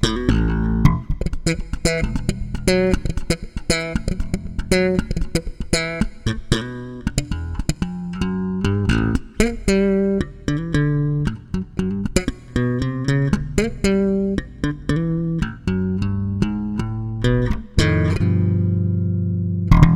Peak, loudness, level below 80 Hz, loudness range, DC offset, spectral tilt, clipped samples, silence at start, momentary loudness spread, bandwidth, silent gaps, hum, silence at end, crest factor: 0 dBFS; -21 LUFS; -28 dBFS; 3 LU; under 0.1%; -6 dB/octave; under 0.1%; 0 s; 7 LU; 14 kHz; none; none; 0 s; 20 dB